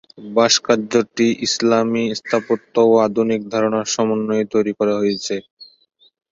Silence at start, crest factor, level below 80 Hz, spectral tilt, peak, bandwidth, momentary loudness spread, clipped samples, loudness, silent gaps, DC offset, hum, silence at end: 0.2 s; 18 dB; -62 dBFS; -4 dB/octave; 0 dBFS; 7.8 kHz; 7 LU; under 0.1%; -18 LUFS; 5.51-5.57 s; under 0.1%; none; 0.65 s